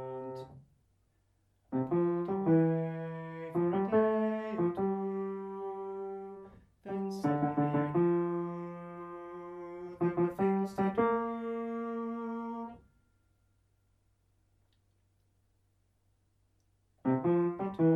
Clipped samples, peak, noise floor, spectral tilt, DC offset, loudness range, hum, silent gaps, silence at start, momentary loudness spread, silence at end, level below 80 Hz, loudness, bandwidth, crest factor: under 0.1%; -16 dBFS; -73 dBFS; -9.5 dB/octave; under 0.1%; 10 LU; none; none; 0 s; 16 LU; 0 s; -70 dBFS; -33 LUFS; 7 kHz; 18 dB